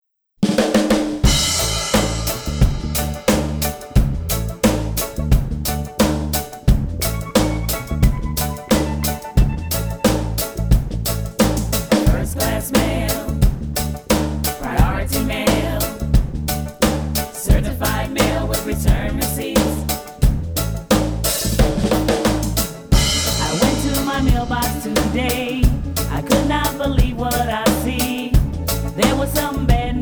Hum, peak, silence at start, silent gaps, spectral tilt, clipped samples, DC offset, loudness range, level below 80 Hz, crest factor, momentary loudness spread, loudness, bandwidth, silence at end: none; -2 dBFS; 0.4 s; none; -4.5 dB/octave; under 0.1%; under 0.1%; 2 LU; -22 dBFS; 16 dB; 6 LU; -19 LUFS; over 20 kHz; 0 s